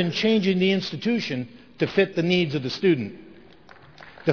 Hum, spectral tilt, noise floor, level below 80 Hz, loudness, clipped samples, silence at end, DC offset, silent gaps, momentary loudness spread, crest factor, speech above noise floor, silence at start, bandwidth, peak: none; -6.5 dB/octave; -50 dBFS; -62 dBFS; -23 LUFS; under 0.1%; 0 s; 0.2%; none; 9 LU; 18 dB; 27 dB; 0 s; 5.4 kHz; -6 dBFS